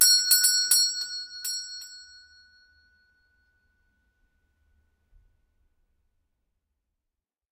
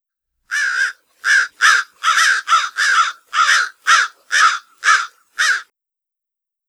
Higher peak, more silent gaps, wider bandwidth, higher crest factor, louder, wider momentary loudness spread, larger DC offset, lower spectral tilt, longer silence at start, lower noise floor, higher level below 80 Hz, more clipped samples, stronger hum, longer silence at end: second, -4 dBFS vs 0 dBFS; neither; about the same, 15 kHz vs 16 kHz; first, 26 dB vs 18 dB; second, -21 LUFS vs -15 LUFS; first, 21 LU vs 7 LU; neither; about the same, 5.5 dB/octave vs 5.5 dB/octave; second, 0 s vs 0.5 s; about the same, -87 dBFS vs -84 dBFS; about the same, -72 dBFS vs -74 dBFS; neither; neither; first, 5.55 s vs 1.05 s